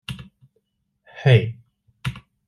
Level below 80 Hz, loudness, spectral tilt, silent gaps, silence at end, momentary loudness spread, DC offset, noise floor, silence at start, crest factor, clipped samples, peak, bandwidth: -52 dBFS; -21 LUFS; -7.5 dB/octave; none; 0.3 s; 21 LU; under 0.1%; -71 dBFS; 0.1 s; 20 dB; under 0.1%; -4 dBFS; 12 kHz